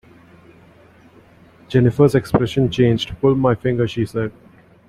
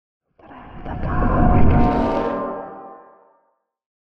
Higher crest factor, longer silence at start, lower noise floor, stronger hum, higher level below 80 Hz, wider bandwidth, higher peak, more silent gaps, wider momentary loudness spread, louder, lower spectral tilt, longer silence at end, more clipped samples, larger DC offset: about the same, 18 dB vs 16 dB; first, 1.7 s vs 0.2 s; second, -48 dBFS vs -67 dBFS; neither; second, -44 dBFS vs -26 dBFS; first, 13.5 kHz vs 5.8 kHz; about the same, -2 dBFS vs -4 dBFS; neither; second, 8 LU vs 23 LU; about the same, -18 LUFS vs -20 LUFS; second, -7.5 dB/octave vs -10 dB/octave; first, 0.6 s vs 0.15 s; neither; neither